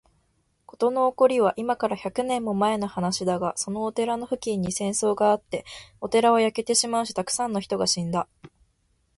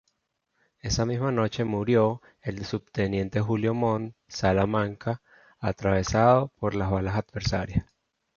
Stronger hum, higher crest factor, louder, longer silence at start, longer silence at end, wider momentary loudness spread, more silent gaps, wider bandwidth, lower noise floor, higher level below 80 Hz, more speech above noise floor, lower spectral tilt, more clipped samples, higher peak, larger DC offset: neither; about the same, 18 dB vs 20 dB; first, -24 LUFS vs -27 LUFS; about the same, 0.8 s vs 0.85 s; first, 0.7 s vs 0.55 s; second, 8 LU vs 11 LU; neither; first, 11.5 kHz vs 7.2 kHz; second, -69 dBFS vs -77 dBFS; second, -60 dBFS vs -44 dBFS; second, 44 dB vs 51 dB; second, -4 dB/octave vs -6 dB/octave; neither; about the same, -8 dBFS vs -6 dBFS; neither